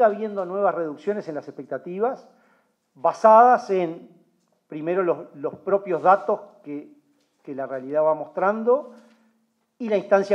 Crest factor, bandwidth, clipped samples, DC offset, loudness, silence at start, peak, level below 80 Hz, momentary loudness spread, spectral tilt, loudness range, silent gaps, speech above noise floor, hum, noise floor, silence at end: 20 dB; 8.2 kHz; under 0.1%; under 0.1%; -22 LUFS; 0 s; -2 dBFS; -86 dBFS; 19 LU; -7 dB/octave; 6 LU; none; 47 dB; none; -68 dBFS; 0 s